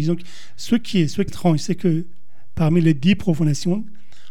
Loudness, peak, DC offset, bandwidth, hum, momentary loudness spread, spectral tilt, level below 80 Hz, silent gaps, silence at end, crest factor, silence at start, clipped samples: -20 LUFS; -4 dBFS; 5%; 13 kHz; none; 14 LU; -6.5 dB/octave; -46 dBFS; none; 0.45 s; 14 dB; 0 s; under 0.1%